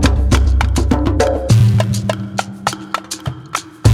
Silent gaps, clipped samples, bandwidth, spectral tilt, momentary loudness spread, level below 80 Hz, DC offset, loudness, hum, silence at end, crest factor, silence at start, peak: none; under 0.1%; 14 kHz; -6 dB/octave; 12 LU; -20 dBFS; under 0.1%; -16 LUFS; none; 0 s; 14 dB; 0 s; 0 dBFS